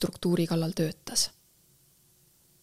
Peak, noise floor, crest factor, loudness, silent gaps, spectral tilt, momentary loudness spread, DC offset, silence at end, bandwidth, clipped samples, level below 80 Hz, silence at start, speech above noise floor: -12 dBFS; -63 dBFS; 20 dB; -29 LUFS; none; -4.5 dB/octave; 4 LU; under 0.1%; 1.35 s; 16 kHz; under 0.1%; -60 dBFS; 0 s; 35 dB